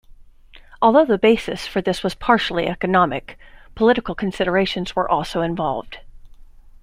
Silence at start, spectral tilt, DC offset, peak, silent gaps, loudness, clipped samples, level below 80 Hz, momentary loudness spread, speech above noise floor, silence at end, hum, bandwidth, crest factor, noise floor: 0.2 s; -6 dB/octave; under 0.1%; -2 dBFS; none; -19 LUFS; under 0.1%; -44 dBFS; 9 LU; 26 dB; 0.4 s; none; 15 kHz; 18 dB; -45 dBFS